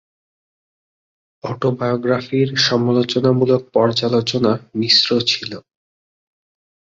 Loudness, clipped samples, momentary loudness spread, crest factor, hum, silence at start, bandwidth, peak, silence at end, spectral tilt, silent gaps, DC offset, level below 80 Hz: -17 LUFS; under 0.1%; 9 LU; 18 dB; none; 1.45 s; 7.8 kHz; -2 dBFS; 1.35 s; -5 dB/octave; none; under 0.1%; -58 dBFS